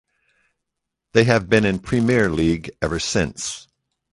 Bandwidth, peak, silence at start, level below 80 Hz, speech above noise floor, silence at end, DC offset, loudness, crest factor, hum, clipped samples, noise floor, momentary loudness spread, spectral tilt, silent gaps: 11.5 kHz; -2 dBFS; 1.15 s; -42 dBFS; 62 dB; 0.55 s; under 0.1%; -20 LUFS; 20 dB; none; under 0.1%; -81 dBFS; 10 LU; -5 dB/octave; none